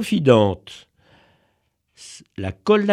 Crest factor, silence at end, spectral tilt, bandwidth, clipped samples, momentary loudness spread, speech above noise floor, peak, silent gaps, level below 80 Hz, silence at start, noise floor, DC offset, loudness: 22 dB; 0 s; -6.5 dB/octave; 13.5 kHz; under 0.1%; 25 LU; 50 dB; 0 dBFS; none; -54 dBFS; 0 s; -69 dBFS; under 0.1%; -19 LUFS